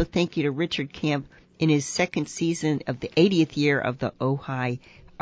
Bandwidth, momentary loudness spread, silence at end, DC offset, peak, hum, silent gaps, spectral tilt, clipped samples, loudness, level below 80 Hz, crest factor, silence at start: 8 kHz; 8 LU; 0.45 s; under 0.1%; -8 dBFS; none; none; -5.5 dB/octave; under 0.1%; -25 LUFS; -54 dBFS; 18 dB; 0 s